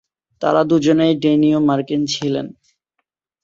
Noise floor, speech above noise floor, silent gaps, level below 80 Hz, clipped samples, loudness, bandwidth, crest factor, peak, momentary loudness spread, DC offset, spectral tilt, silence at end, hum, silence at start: -75 dBFS; 59 dB; none; -58 dBFS; under 0.1%; -16 LUFS; 7.6 kHz; 16 dB; -2 dBFS; 8 LU; under 0.1%; -6 dB/octave; 0.95 s; none; 0.4 s